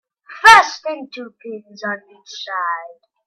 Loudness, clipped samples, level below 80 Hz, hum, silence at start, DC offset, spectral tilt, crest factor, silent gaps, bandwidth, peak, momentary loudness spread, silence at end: -13 LUFS; under 0.1%; -54 dBFS; none; 0.3 s; under 0.1%; -0.5 dB/octave; 18 dB; none; 14 kHz; 0 dBFS; 25 LU; 0.4 s